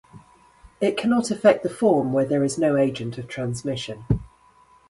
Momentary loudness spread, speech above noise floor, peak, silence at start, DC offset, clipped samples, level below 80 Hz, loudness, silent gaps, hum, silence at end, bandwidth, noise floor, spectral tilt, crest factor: 11 LU; 34 dB; -2 dBFS; 0.15 s; under 0.1%; under 0.1%; -46 dBFS; -23 LUFS; none; none; 0.6 s; 11.5 kHz; -55 dBFS; -6 dB/octave; 20 dB